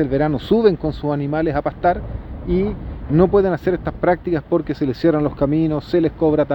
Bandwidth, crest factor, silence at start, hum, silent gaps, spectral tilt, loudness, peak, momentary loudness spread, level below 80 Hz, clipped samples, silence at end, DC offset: 6 kHz; 16 dB; 0 s; none; none; -9.5 dB/octave; -19 LUFS; -2 dBFS; 7 LU; -34 dBFS; under 0.1%; 0 s; under 0.1%